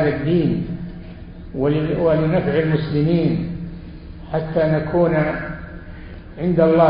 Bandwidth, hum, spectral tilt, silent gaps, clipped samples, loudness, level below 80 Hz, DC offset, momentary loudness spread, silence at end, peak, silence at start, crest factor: 5.2 kHz; none; -13 dB/octave; none; under 0.1%; -19 LUFS; -38 dBFS; under 0.1%; 20 LU; 0 s; -2 dBFS; 0 s; 16 dB